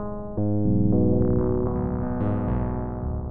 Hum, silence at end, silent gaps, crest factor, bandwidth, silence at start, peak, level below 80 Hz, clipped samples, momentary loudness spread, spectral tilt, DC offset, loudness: none; 0 s; none; 14 dB; 2.8 kHz; 0 s; -10 dBFS; -34 dBFS; under 0.1%; 9 LU; -12.5 dB/octave; under 0.1%; -25 LUFS